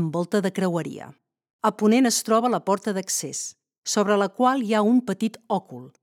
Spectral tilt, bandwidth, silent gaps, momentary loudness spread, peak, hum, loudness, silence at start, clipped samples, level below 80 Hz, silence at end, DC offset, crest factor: -4.5 dB/octave; 17 kHz; 1.50-1.59 s, 3.78-3.82 s; 12 LU; -6 dBFS; none; -23 LUFS; 0 s; under 0.1%; -78 dBFS; 0.15 s; under 0.1%; 18 dB